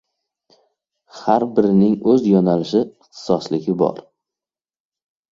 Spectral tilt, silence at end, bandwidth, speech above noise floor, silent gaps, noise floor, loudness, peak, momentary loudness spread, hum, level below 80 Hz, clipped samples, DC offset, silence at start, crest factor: -8 dB/octave; 1.3 s; 7.6 kHz; over 74 dB; none; under -90 dBFS; -18 LUFS; -2 dBFS; 12 LU; none; -58 dBFS; under 0.1%; under 0.1%; 1.15 s; 18 dB